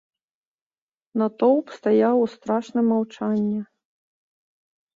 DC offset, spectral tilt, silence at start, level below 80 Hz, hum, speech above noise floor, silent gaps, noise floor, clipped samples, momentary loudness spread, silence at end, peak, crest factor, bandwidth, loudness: under 0.1%; -8 dB/octave; 1.15 s; -70 dBFS; none; 46 dB; none; -67 dBFS; under 0.1%; 9 LU; 1.3 s; -6 dBFS; 18 dB; 7.4 kHz; -22 LUFS